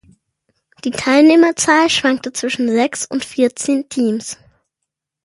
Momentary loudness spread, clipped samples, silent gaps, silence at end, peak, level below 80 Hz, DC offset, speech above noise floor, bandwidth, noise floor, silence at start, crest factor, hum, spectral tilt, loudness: 14 LU; under 0.1%; none; 0.9 s; 0 dBFS; -58 dBFS; under 0.1%; 65 dB; 11.5 kHz; -79 dBFS; 0.85 s; 16 dB; none; -3 dB/octave; -15 LUFS